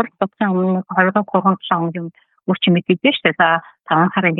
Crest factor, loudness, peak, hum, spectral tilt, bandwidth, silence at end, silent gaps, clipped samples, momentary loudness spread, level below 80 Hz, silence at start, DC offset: 16 dB; -17 LUFS; -2 dBFS; none; -10.5 dB/octave; 4.1 kHz; 0 s; none; under 0.1%; 8 LU; -72 dBFS; 0 s; under 0.1%